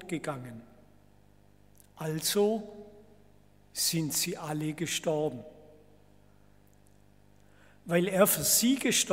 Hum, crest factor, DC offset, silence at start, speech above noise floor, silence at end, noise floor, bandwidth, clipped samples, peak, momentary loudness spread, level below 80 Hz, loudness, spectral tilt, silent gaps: 50 Hz at -60 dBFS; 24 dB; under 0.1%; 0 s; 32 dB; 0 s; -61 dBFS; 16 kHz; under 0.1%; -10 dBFS; 22 LU; -66 dBFS; -29 LUFS; -3 dB/octave; none